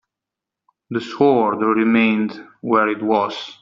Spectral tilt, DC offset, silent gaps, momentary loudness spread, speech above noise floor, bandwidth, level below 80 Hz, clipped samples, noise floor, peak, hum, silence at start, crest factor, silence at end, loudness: -4 dB/octave; under 0.1%; none; 11 LU; 67 dB; 7.4 kHz; -64 dBFS; under 0.1%; -85 dBFS; -2 dBFS; none; 0.9 s; 16 dB; 0.05 s; -18 LUFS